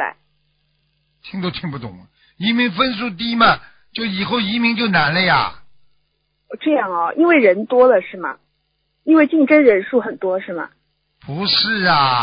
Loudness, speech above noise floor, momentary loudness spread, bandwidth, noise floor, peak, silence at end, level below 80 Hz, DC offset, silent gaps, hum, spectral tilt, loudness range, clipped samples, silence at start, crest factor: -16 LUFS; 52 dB; 16 LU; 5.2 kHz; -68 dBFS; 0 dBFS; 0 s; -54 dBFS; under 0.1%; none; none; -10 dB/octave; 5 LU; under 0.1%; 0 s; 18 dB